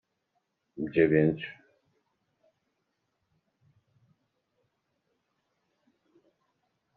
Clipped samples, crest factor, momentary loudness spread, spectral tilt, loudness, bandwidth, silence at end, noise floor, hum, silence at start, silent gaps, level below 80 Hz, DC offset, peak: under 0.1%; 24 dB; 16 LU; -7 dB/octave; -27 LUFS; 4.4 kHz; 5.45 s; -80 dBFS; none; 0.75 s; none; -68 dBFS; under 0.1%; -10 dBFS